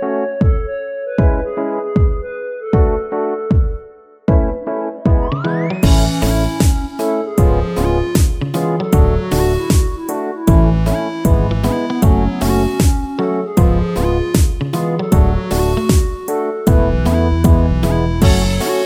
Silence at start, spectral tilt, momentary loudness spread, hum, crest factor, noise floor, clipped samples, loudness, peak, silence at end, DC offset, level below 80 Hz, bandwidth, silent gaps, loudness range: 0 s; -6.5 dB/octave; 7 LU; none; 14 dB; -39 dBFS; under 0.1%; -16 LUFS; 0 dBFS; 0 s; under 0.1%; -18 dBFS; 16.5 kHz; none; 3 LU